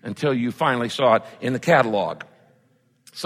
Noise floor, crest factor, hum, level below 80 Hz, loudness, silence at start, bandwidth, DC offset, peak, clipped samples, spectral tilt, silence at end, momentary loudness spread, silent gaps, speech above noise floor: -62 dBFS; 20 dB; none; -66 dBFS; -21 LUFS; 0.05 s; 16 kHz; under 0.1%; -4 dBFS; under 0.1%; -5.5 dB/octave; 0 s; 11 LU; none; 41 dB